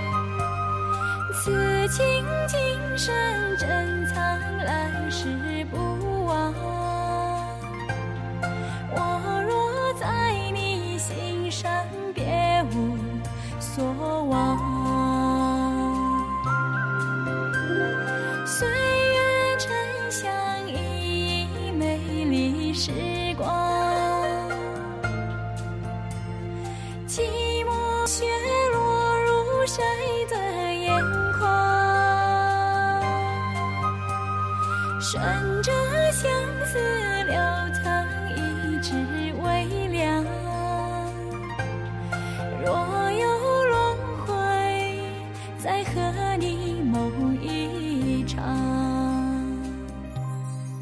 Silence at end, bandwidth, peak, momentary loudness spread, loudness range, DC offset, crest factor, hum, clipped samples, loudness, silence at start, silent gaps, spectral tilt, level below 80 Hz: 0 s; 13.5 kHz; -10 dBFS; 9 LU; 5 LU; under 0.1%; 16 dB; none; under 0.1%; -25 LUFS; 0 s; none; -5 dB/octave; -42 dBFS